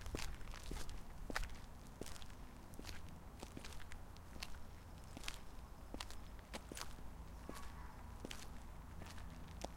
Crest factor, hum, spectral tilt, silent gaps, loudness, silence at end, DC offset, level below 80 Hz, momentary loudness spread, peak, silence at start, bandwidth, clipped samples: 28 dB; none; -4 dB/octave; none; -53 LUFS; 0 s; under 0.1%; -54 dBFS; 8 LU; -22 dBFS; 0 s; 16.5 kHz; under 0.1%